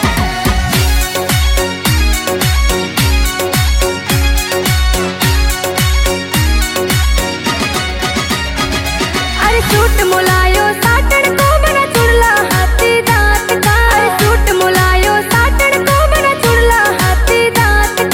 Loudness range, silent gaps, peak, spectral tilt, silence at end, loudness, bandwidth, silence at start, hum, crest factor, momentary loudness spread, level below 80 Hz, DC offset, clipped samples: 3 LU; none; 0 dBFS; -4 dB/octave; 0 s; -11 LUFS; 17 kHz; 0 s; none; 12 dB; 5 LU; -16 dBFS; under 0.1%; under 0.1%